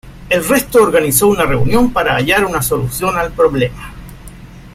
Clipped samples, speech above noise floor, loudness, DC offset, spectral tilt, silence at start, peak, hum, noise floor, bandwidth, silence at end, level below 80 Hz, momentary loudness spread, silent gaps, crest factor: under 0.1%; 21 dB; -13 LUFS; under 0.1%; -4.5 dB/octave; 0.05 s; 0 dBFS; none; -34 dBFS; 16.5 kHz; 0.05 s; -32 dBFS; 7 LU; none; 14 dB